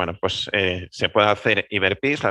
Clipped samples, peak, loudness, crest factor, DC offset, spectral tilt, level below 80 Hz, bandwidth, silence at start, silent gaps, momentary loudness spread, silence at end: under 0.1%; -2 dBFS; -21 LUFS; 20 dB; under 0.1%; -4.5 dB/octave; -56 dBFS; 11 kHz; 0 s; none; 6 LU; 0 s